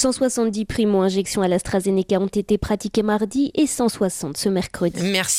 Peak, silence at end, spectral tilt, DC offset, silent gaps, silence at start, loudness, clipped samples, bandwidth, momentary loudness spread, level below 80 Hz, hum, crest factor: -4 dBFS; 0 s; -4.5 dB/octave; under 0.1%; none; 0 s; -21 LUFS; under 0.1%; 16 kHz; 3 LU; -44 dBFS; none; 16 dB